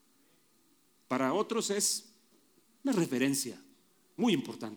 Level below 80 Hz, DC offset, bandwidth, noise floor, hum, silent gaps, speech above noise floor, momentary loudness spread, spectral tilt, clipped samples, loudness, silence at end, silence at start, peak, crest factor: -84 dBFS; under 0.1%; over 20 kHz; -69 dBFS; none; none; 38 dB; 9 LU; -3.5 dB/octave; under 0.1%; -32 LUFS; 0 s; 1.1 s; -16 dBFS; 18 dB